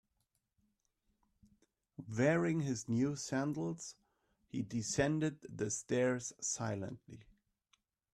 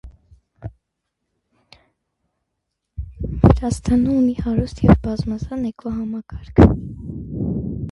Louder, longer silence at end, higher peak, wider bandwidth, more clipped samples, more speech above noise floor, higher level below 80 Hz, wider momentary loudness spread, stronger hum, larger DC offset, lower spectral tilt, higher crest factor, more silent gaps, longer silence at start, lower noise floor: second, -37 LUFS vs -19 LUFS; first, 0.95 s vs 0 s; second, -18 dBFS vs 0 dBFS; first, 13 kHz vs 11.5 kHz; neither; second, 47 dB vs 60 dB; second, -70 dBFS vs -30 dBFS; second, 14 LU vs 21 LU; neither; neither; second, -5 dB/octave vs -8.5 dB/octave; about the same, 20 dB vs 20 dB; neither; first, 2 s vs 0.05 s; first, -83 dBFS vs -77 dBFS